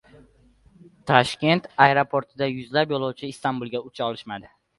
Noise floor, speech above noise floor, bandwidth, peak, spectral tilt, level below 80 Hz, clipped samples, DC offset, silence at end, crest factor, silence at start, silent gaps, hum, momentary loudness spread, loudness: -57 dBFS; 34 dB; 11.5 kHz; 0 dBFS; -5.5 dB/octave; -60 dBFS; under 0.1%; under 0.1%; 0.3 s; 24 dB; 1.05 s; none; none; 15 LU; -23 LUFS